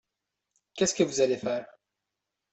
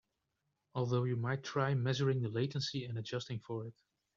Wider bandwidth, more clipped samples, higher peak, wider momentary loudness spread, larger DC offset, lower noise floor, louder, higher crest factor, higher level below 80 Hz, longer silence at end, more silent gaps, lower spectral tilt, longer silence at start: first, 8.4 kHz vs 7.4 kHz; neither; first, -10 dBFS vs -20 dBFS; about the same, 10 LU vs 10 LU; neither; about the same, -86 dBFS vs -85 dBFS; first, -28 LUFS vs -37 LUFS; about the same, 22 dB vs 18 dB; first, -68 dBFS vs -74 dBFS; first, 0.85 s vs 0.45 s; neither; second, -3.5 dB/octave vs -5.5 dB/octave; about the same, 0.75 s vs 0.75 s